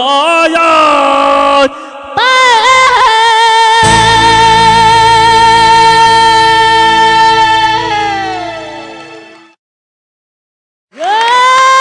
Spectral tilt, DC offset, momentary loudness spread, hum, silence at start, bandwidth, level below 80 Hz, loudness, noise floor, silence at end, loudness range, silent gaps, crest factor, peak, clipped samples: -2.5 dB/octave; under 0.1%; 11 LU; none; 0 s; 10 kHz; -34 dBFS; -6 LUFS; -33 dBFS; 0 s; 11 LU; 9.59-10.88 s; 8 dB; 0 dBFS; under 0.1%